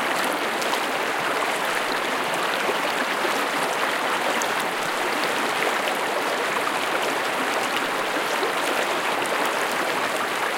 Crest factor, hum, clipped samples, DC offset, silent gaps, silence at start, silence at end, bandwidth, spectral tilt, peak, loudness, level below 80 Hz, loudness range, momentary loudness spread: 18 dB; none; under 0.1%; under 0.1%; none; 0 s; 0 s; 17 kHz; -1.5 dB/octave; -6 dBFS; -23 LUFS; -68 dBFS; 0 LU; 1 LU